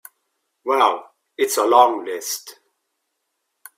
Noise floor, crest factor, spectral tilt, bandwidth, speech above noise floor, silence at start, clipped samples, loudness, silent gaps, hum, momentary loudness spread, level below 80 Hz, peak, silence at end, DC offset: -75 dBFS; 22 dB; -1 dB/octave; 16 kHz; 57 dB; 0.65 s; under 0.1%; -19 LUFS; none; none; 15 LU; -74 dBFS; 0 dBFS; 1.25 s; under 0.1%